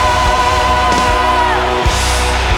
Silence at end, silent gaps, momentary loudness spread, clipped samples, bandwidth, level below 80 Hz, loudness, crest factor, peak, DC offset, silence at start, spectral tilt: 0 s; none; 2 LU; under 0.1%; 17.5 kHz; -20 dBFS; -12 LUFS; 12 dB; 0 dBFS; under 0.1%; 0 s; -3.5 dB/octave